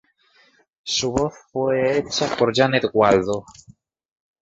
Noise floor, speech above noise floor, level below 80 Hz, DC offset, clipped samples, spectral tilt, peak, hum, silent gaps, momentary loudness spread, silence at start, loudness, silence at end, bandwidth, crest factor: -58 dBFS; 38 dB; -50 dBFS; under 0.1%; under 0.1%; -4 dB/octave; -2 dBFS; none; none; 9 LU; 0.85 s; -20 LUFS; 1 s; 8.2 kHz; 20 dB